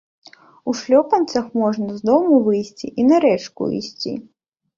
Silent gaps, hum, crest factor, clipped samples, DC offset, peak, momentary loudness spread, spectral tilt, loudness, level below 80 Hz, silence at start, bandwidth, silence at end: none; none; 16 dB; under 0.1%; under 0.1%; -2 dBFS; 13 LU; -6 dB/octave; -18 LUFS; -62 dBFS; 0.65 s; 7.6 kHz; 0.55 s